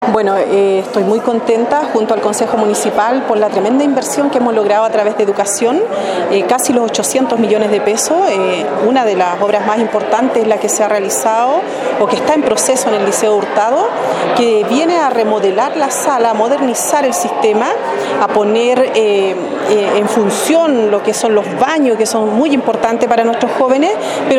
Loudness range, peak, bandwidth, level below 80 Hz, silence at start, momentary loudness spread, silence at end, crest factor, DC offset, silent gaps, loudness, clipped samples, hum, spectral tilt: 1 LU; 0 dBFS; 16.5 kHz; -58 dBFS; 0 s; 3 LU; 0 s; 12 dB; under 0.1%; none; -13 LUFS; under 0.1%; none; -3.5 dB/octave